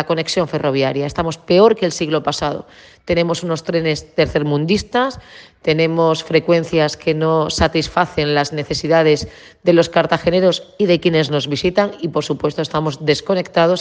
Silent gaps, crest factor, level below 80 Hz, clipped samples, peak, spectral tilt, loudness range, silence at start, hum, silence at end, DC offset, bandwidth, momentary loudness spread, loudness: none; 16 dB; -42 dBFS; under 0.1%; 0 dBFS; -5.5 dB/octave; 3 LU; 0 s; none; 0 s; under 0.1%; 9.8 kHz; 7 LU; -17 LUFS